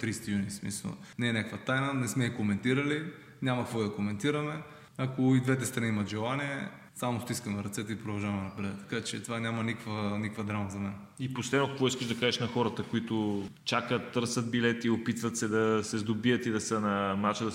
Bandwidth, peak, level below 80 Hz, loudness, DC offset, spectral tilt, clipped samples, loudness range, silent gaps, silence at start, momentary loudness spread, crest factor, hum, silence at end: 16 kHz; -12 dBFS; -70 dBFS; -32 LUFS; under 0.1%; -5 dB/octave; under 0.1%; 5 LU; none; 0 s; 8 LU; 20 dB; none; 0 s